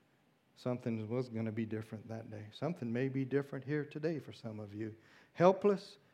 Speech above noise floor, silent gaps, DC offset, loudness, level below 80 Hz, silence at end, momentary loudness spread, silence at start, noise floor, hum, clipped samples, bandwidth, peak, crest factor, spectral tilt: 35 dB; none; under 0.1%; -37 LUFS; -86 dBFS; 0.2 s; 16 LU; 0.6 s; -72 dBFS; none; under 0.1%; 11.5 kHz; -14 dBFS; 24 dB; -8 dB/octave